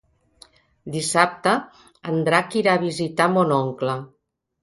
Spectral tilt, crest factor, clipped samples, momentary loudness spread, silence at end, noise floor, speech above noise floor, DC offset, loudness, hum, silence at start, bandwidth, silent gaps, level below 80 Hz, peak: -4.5 dB/octave; 22 dB; under 0.1%; 11 LU; 0.55 s; -54 dBFS; 33 dB; under 0.1%; -21 LUFS; none; 0.85 s; 11.5 kHz; none; -64 dBFS; 0 dBFS